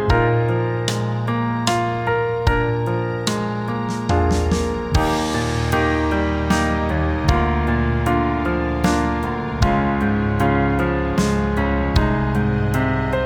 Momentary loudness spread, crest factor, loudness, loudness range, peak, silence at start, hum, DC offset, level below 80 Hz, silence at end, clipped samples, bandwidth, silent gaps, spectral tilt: 4 LU; 16 dB; -20 LUFS; 2 LU; -2 dBFS; 0 s; none; under 0.1%; -28 dBFS; 0 s; under 0.1%; 18 kHz; none; -6 dB/octave